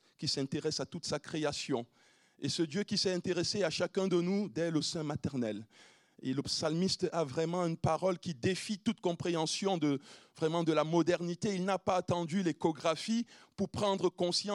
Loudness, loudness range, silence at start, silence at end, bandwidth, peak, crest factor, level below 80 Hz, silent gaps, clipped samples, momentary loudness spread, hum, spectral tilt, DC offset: -34 LUFS; 2 LU; 0.2 s; 0 s; 12 kHz; -16 dBFS; 18 dB; -70 dBFS; none; under 0.1%; 6 LU; none; -5 dB/octave; under 0.1%